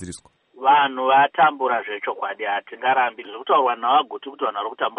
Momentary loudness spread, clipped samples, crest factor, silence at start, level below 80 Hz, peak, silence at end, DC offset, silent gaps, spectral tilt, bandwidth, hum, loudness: 11 LU; under 0.1%; 16 dB; 0 s; -66 dBFS; -6 dBFS; 0.05 s; under 0.1%; none; -3.5 dB/octave; 10 kHz; none; -20 LUFS